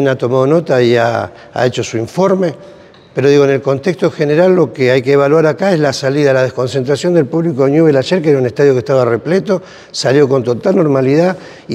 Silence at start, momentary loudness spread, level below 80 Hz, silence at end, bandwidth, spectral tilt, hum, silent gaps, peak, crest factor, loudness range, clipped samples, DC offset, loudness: 0 s; 7 LU; -58 dBFS; 0 s; 11.5 kHz; -6.5 dB/octave; none; none; 0 dBFS; 12 dB; 2 LU; under 0.1%; under 0.1%; -12 LUFS